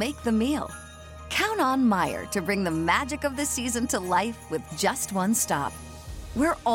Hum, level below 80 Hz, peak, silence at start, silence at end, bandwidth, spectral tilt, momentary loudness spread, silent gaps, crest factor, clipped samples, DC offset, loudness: none; -46 dBFS; -10 dBFS; 0 s; 0 s; 17 kHz; -3.5 dB/octave; 13 LU; none; 16 dB; under 0.1%; under 0.1%; -26 LUFS